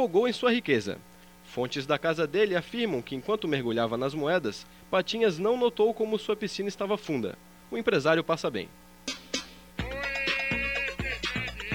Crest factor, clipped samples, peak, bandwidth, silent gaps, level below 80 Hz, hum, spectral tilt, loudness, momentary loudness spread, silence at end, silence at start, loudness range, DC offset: 18 dB; under 0.1%; -10 dBFS; 18.5 kHz; none; -52 dBFS; none; -5 dB/octave; -29 LUFS; 12 LU; 0 s; 0 s; 3 LU; under 0.1%